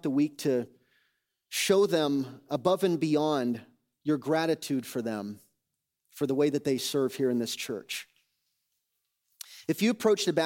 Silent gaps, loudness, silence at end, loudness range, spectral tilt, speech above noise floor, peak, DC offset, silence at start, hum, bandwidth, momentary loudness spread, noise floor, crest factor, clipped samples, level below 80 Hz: none; -29 LUFS; 0 s; 4 LU; -4.5 dB/octave; 56 dB; -10 dBFS; under 0.1%; 0.05 s; none; 17 kHz; 12 LU; -84 dBFS; 18 dB; under 0.1%; -78 dBFS